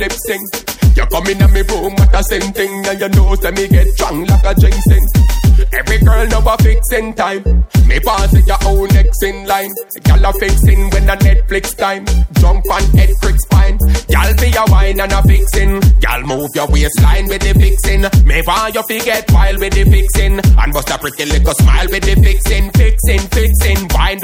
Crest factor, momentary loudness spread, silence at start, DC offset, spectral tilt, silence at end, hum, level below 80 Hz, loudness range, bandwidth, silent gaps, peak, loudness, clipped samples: 8 dB; 6 LU; 0 s; under 0.1%; -5.5 dB/octave; 0 s; none; -10 dBFS; 1 LU; 16.5 kHz; none; 0 dBFS; -12 LUFS; under 0.1%